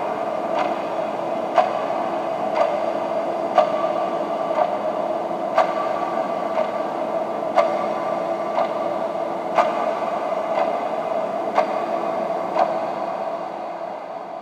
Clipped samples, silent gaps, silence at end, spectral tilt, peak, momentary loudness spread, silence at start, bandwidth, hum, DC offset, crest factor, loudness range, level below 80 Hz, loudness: under 0.1%; none; 0 s; -5.5 dB/octave; -2 dBFS; 5 LU; 0 s; 10.5 kHz; none; under 0.1%; 20 dB; 1 LU; -76 dBFS; -23 LUFS